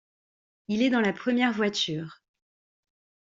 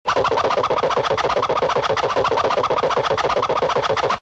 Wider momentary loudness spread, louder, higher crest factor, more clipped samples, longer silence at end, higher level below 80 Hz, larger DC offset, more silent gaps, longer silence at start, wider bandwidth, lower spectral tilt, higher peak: first, 10 LU vs 1 LU; second, -26 LUFS vs -19 LUFS; first, 20 dB vs 12 dB; neither; first, 1.25 s vs 0 s; second, -70 dBFS vs -48 dBFS; neither; neither; first, 0.7 s vs 0.05 s; about the same, 7.8 kHz vs 8.4 kHz; about the same, -4.5 dB/octave vs -4 dB/octave; second, -10 dBFS vs -6 dBFS